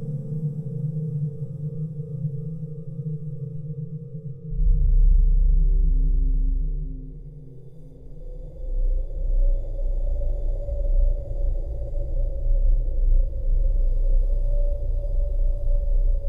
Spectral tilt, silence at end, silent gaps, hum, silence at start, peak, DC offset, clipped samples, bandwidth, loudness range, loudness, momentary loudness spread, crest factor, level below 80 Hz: -12 dB/octave; 0 s; none; none; 0 s; -10 dBFS; under 0.1%; under 0.1%; 0.8 kHz; 7 LU; -28 LUFS; 13 LU; 12 dB; -22 dBFS